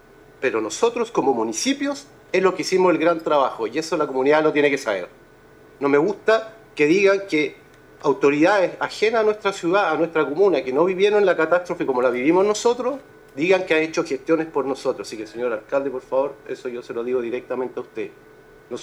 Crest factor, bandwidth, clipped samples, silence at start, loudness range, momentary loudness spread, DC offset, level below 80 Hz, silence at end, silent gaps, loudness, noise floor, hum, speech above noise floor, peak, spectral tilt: 18 dB; 13 kHz; under 0.1%; 0.4 s; 6 LU; 11 LU; under 0.1%; -62 dBFS; 0 s; none; -21 LUFS; -49 dBFS; none; 28 dB; -4 dBFS; -4.5 dB/octave